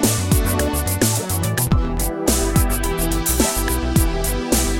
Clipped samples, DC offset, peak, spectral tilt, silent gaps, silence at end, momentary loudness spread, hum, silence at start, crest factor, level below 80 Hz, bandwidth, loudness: under 0.1%; under 0.1%; -2 dBFS; -4.5 dB/octave; none; 0 s; 3 LU; none; 0 s; 16 dB; -24 dBFS; 17 kHz; -19 LUFS